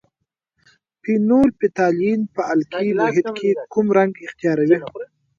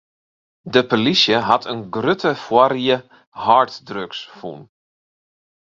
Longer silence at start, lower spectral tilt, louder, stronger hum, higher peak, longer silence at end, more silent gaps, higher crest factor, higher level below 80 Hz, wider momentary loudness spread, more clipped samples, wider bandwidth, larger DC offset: first, 1.05 s vs 0.65 s; first, -7.5 dB/octave vs -5 dB/octave; about the same, -19 LUFS vs -17 LUFS; neither; about the same, -2 dBFS vs 0 dBFS; second, 0.35 s vs 1.15 s; second, none vs 3.27-3.32 s; about the same, 18 dB vs 20 dB; about the same, -56 dBFS vs -60 dBFS; second, 7 LU vs 15 LU; neither; about the same, 7.4 kHz vs 7.6 kHz; neither